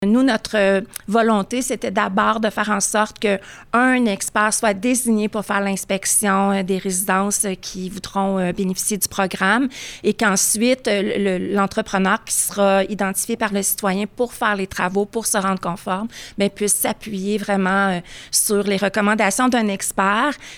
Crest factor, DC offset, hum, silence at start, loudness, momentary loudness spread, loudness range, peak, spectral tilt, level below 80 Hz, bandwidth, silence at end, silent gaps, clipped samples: 14 dB; under 0.1%; none; 0 s; -19 LUFS; 6 LU; 3 LU; -4 dBFS; -3.5 dB/octave; -50 dBFS; over 20 kHz; 0 s; none; under 0.1%